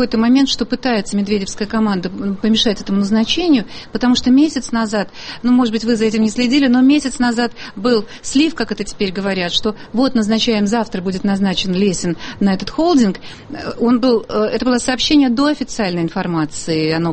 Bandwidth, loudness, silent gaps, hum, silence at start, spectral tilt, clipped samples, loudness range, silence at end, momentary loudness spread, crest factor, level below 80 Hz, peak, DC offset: 8.8 kHz; -16 LUFS; none; none; 0 s; -5 dB/octave; under 0.1%; 2 LU; 0 s; 8 LU; 14 dB; -40 dBFS; -2 dBFS; under 0.1%